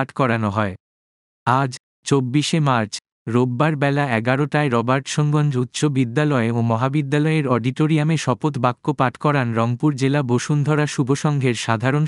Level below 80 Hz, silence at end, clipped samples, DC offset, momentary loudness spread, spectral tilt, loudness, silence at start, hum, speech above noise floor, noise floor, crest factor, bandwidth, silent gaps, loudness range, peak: -64 dBFS; 0 s; under 0.1%; under 0.1%; 3 LU; -6 dB/octave; -20 LUFS; 0 s; none; over 71 dB; under -90 dBFS; 18 dB; 11.5 kHz; 0.80-1.46 s, 1.80-2.03 s, 3.12-3.26 s; 2 LU; -2 dBFS